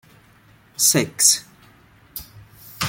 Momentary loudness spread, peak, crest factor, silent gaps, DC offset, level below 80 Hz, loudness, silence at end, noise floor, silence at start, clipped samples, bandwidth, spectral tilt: 21 LU; 0 dBFS; 24 dB; none; under 0.1%; -58 dBFS; -16 LUFS; 0 s; -53 dBFS; 0.8 s; under 0.1%; 17 kHz; -1.5 dB/octave